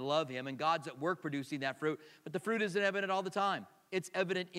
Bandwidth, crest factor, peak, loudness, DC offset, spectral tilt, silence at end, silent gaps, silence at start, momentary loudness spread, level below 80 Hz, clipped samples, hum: 16 kHz; 20 dB; -18 dBFS; -36 LUFS; under 0.1%; -5 dB/octave; 0 s; none; 0 s; 8 LU; -88 dBFS; under 0.1%; none